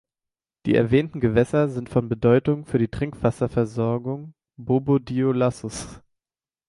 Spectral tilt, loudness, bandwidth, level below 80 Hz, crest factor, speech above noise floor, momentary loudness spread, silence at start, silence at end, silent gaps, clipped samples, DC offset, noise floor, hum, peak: -7.5 dB/octave; -23 LUFS; 11.5 kHz; -48 dBFS; 20 dB; over 68 dB; 13 LU; 0.65 s; 0.7 s; none; under 0.1%; under 0.1%; under -90 dBFS; none; -4 dBFS